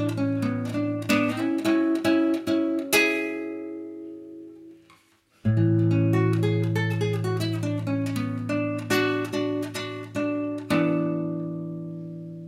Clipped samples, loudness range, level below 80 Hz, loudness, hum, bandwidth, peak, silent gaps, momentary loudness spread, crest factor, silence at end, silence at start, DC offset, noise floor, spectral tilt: under 0.1%; 4 LU; -60 dBFS; -25 LUFS; none; 16 kHz; -8 dBFS; none; 14 LU; 18 dB; 0 s; 0 s; under 0.1%; -61 dBFS; -6 dB/octave